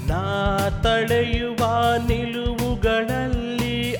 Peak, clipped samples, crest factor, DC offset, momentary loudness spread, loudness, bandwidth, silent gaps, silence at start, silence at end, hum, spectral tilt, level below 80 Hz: -8 dBFS; under 0.1%; 14 dB; under 0.1%; 5 LU; -22 LUFS; 19 kHz; none; 0 s; 0 s; none; -5.5 dB/octave; -30 dBFS